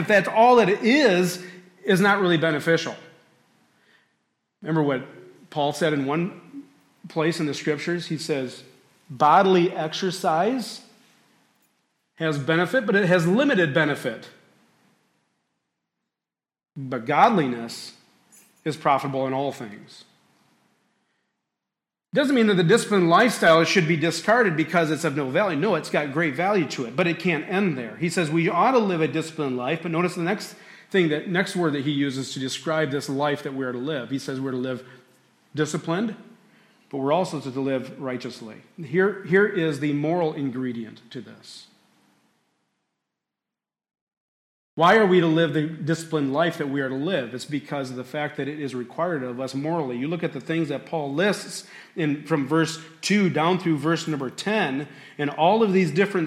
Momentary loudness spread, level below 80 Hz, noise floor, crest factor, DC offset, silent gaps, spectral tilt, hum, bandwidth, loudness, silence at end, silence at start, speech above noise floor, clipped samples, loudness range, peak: 15 LU; -72 dBFS; under -90 dBFS; 18 dB; under 0.1%; 44.01-44.07 s, 44.17-44.77 s; -5.5 dB/octave; none; 15.5 kHz; -23 LUFS; 0 s; 0 s; over 67 dB; under 0.1%; 8 LU; -6 dBFS